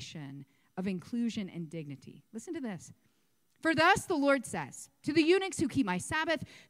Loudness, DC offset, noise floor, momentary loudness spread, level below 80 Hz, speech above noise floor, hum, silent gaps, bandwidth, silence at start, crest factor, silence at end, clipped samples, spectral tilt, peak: -31 LUFS; under 0.1%; -75 dBFS; 20 LU; -66 dBFS; 42 dB; none; none; 15.5 kHz; 0 s; 22 dB; 0.1 s; under 0.1%; -4.5 dB/octave; -12 dBFS